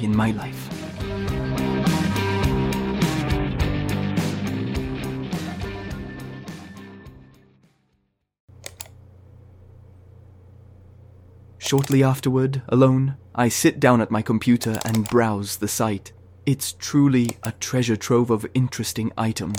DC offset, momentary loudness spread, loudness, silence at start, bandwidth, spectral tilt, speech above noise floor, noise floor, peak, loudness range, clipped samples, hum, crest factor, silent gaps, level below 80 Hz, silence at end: under 0.1%; 15 LU; -22 LUFS; 0 s; 18 kHz; -5.5 dB/octave; 49 dB; -70 dBFS; -4 dBFS; 16 LU; under 0.1%; none; 20 dB; 8.40-8.48 s; -40 dBFS; 0 s